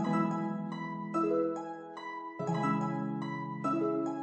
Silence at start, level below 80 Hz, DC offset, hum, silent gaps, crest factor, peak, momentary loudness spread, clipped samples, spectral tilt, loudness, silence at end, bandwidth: 0 s; -84 dBFS; under 0.1%; none; none; 14 dB; -18 dBFS; 11 LU; under 0.1%; -8 dB/octave; -34 LUFS; 0 s; 8.4 kHz